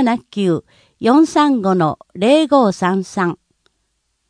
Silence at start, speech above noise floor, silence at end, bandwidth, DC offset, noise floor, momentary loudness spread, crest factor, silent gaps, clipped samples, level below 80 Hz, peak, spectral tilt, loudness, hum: 0 s; 53 dB; 0.95 s; 10.5 kHz; under 0.1%; -68 dBFS; 9 LU; 16 dB; none; under 0.1%; -60 dBFS; 0 dBFS; -6 dB/octave; -16 LUFS; none